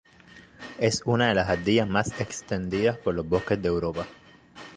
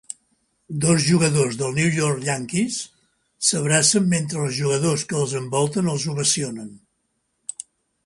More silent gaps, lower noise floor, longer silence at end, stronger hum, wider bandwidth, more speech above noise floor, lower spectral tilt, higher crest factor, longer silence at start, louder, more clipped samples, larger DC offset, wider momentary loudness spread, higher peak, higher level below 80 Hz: neither; second, -52 dBFS vs -72 dBFS; second, 0 s vs 1.3 s; neither; second, 10 kHz vs 11.5 kHz; second, 26 dB vs 51 dB; about the same, -5 dB/octave vs -4 dB/octave; about the same, 20 dB vs 18 dB; second, 0.35 s vs 0.7 s; second, -26 LUFS vs -20 LUFS; neither; neither; second, 14 LU vs 18 LU; second, -8 dBFS vs -4 dBFS; first, -48 dBFS vs -60 dBFS